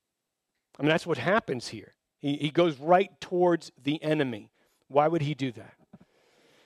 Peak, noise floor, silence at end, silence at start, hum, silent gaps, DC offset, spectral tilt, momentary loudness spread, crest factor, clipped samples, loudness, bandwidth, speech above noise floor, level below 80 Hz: -8 dBFS; -84 dBFS; 0.7 s; 0.8 s; none; none; under 0.1%; -6.5 dB/octave; 11 LU; 20 dB; under 0.1%; -27 LUFS; 12 kHz; 57 dB; -70 dBFS